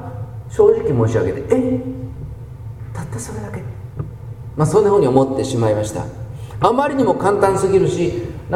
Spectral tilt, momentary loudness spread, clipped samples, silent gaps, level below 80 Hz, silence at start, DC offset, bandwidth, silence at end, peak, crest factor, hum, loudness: -7 dB/octave; 17 LU; under 0.1%; none; -40 dBFS; 0 s; under 0.1%; 14 kHz; 0 s; 0 dBFS; 18 dB; none; -17 LUFS